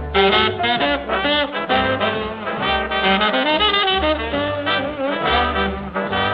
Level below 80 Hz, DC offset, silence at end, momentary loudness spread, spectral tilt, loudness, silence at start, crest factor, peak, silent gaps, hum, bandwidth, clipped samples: -36 dBFS; under 0.1%; 0 s; 7 LU; -7.5 dB/octave; -18 LUFS; 0 s; 16 dB; -2 dBFS; none; none; 5.8 kHz; under 0.1%